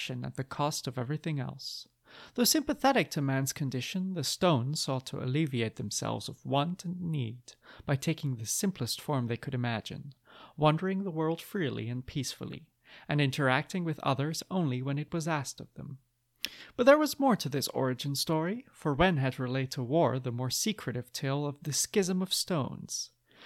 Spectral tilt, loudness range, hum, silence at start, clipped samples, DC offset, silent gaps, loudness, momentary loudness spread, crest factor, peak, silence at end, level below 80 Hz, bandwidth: -4.5 dB/octave; 4 LU; none; 0 s; under 0.1%; under 0.1%; none; -31 LUFS; 13 LU; 24 dB; -8 dBFS; 0 s; -60 dBFS; 17 kHz